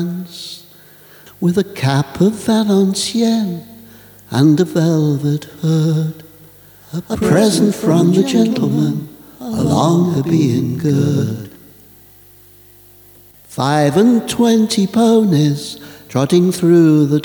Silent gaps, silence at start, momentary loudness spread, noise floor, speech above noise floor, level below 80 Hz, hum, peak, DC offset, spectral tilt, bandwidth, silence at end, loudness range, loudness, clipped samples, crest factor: none; 0 s; 16 LU; -44 dBFS; 30 dB; -50 dBFS; 50 Hz at -40 dBFS; 0 dBFS; under 0.1%; -6.5 dB/octave; over 20 kHz; 0 s; 5 LU; -14 LUFS; under 0.1%; 14 dB